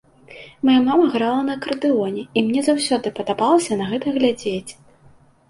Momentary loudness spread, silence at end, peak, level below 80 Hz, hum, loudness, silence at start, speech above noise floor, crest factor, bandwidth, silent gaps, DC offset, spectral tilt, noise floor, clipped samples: 8 LU; 0.8 s; -4 dBFS; -60 dBFS; none; -19 LUFS; 0.3 s; 32 dB; 16 dB; 11.5 kHz; none; under 0.1%; -4.5 dB/octave; -51 dBFS; under 0.1%